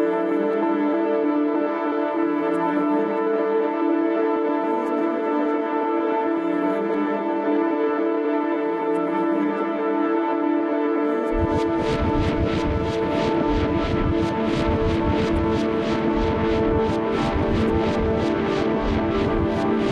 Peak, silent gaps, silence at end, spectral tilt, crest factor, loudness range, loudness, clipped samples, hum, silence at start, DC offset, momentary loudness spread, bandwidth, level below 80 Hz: -10 dBFS; none; 0 s; -7.5 dB/octave; 12 dB; 1 LU; -22 LUFS; under 0.1%; none; 0 s; under 0.1%; 2 LU; 9.2 kHz; -36 dBFS